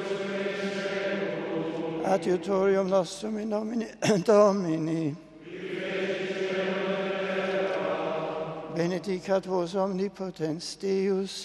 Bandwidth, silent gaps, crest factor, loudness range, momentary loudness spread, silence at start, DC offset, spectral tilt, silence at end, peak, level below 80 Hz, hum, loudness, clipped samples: 12.5 kHz; none; 20 dB; 4 LU; 9 LU; 0 s; under 0.1%; -5.5 dB/octave; 0 s; -8 dBFS; -68 dBFS; none; -28 LUFS; under 0.1%